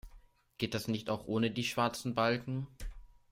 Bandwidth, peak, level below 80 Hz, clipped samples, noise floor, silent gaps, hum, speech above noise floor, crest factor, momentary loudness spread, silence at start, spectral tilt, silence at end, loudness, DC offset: 16 kHz; -16 dBFS; -54 dBFS; under 0.1%; -60 dBFS; none; none; 26 dB; 18 dB; 11 LU; 0.05 s; -5 dB/octave; 0.25 s; -35 LUFS; under 0.1%